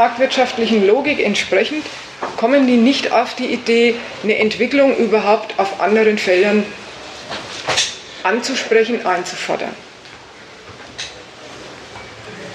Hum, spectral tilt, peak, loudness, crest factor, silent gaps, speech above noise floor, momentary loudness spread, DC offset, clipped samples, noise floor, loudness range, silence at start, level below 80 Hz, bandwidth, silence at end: none; -3.5 dB/octave; -2 dBFS; -16 LUFS; 16 dB; none; 23 dB; 20 LU; under 0.1%; under 0.1%; -39 dBFS; 7 LU; 0 s; -56 dBFS; 11.5 kHz; 0 s